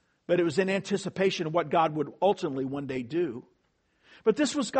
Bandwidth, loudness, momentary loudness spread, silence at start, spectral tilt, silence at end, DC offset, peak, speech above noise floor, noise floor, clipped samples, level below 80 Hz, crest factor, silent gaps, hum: 8.8 kHz; -28 LUFS; 7 LU; 0.3 s; -5 dB/octave; 0 s; under 0.1%; -10 dBFS; 44 dB; -72 dBFS; under 0.1%; -68 dBFS; 18 dB; none; none